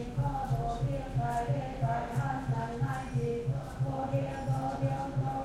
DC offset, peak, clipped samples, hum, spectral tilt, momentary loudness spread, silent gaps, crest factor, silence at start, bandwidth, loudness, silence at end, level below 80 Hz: under 0.1%; -18 dBFS; under 0.1%; none; -8 dB/octave; 2 LU; none; 14 dB; 0 s; 12 kHz; -33 LUFS; 0 s; -46 dBFS